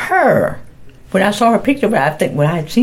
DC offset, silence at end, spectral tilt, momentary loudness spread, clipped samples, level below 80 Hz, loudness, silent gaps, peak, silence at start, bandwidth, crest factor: under 0.1%; 0 s; -6 dB/octave; 7 LU; under 0.1%; -44 dBFS; -14 LUFS; none; 0 dBFS; 0 s; 16.5 kHz; 14 dB